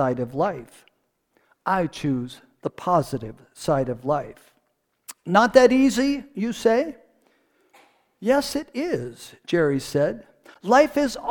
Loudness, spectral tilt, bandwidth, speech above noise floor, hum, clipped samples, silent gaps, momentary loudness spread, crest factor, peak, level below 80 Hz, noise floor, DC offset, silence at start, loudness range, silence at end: -22 LUFS; -5.5 dB/octave; 19 kHz; 50 dB; none; under 0.1%; none; 19 LU; 22 dB; -2 dBFS; -52 dBFS; -72 dBFS; under 0.1%; 0 s; 6 LU; 0 s